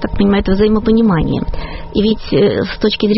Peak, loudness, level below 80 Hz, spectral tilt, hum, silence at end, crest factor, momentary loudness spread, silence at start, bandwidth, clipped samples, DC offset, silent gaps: 0 dBFS; -14 LUFS; -26 dBFS; -5.5 dB/octave; none; 0 s; 12 dB; 8 LU; 0 s; 6 kHz; under 0.1%; under 0.1%; none